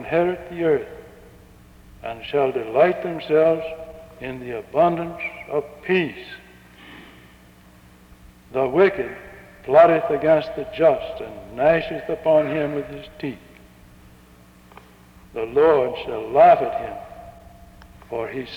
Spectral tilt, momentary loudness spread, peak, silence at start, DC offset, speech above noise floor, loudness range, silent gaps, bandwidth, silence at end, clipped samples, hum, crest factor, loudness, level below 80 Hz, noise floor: -7 dB/octave; 21 LU; -2 dBFS; 0 s; under 0.1%; 29 dB; 7 LU; none; 12 kHz; 0 s; under 0.1%; none; 20 dB; -20 LUFS; -52 dBFS; -49 dBFS